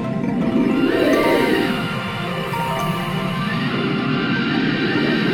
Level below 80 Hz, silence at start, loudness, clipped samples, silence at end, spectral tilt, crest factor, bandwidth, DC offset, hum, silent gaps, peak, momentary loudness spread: -44 dBFS; 0 s; -19 LUFS; under 0.1%; 0 s; -6 dB/octave; 14 dB; 17.5 kHz; under 0.1%; none; none; -4 dBFS; 6 LU